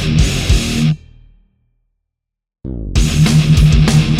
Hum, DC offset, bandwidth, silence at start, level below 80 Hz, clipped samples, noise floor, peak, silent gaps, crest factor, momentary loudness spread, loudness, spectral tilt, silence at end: none; under 0.1%; 14 kHz; 0 s; -20 dBFS; under 0.1%; -79 dBFS; 0 dBFS; none; 14 dB; 16 LU; -13 LUFS; -5.5 dB/octave; 0 s